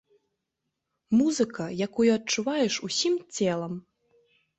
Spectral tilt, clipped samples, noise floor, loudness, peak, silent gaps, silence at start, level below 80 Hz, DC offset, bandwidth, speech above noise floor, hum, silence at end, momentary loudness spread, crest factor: -4 dB/octave; under 0.1%; -83 dBFS; -26 LUFS; -12 dBFS; none; 1.1 s; -68 dBFS; under 0.1%; 8.2 kHz; 57 dB; none; 0.8 s; 8 LU; 16 dB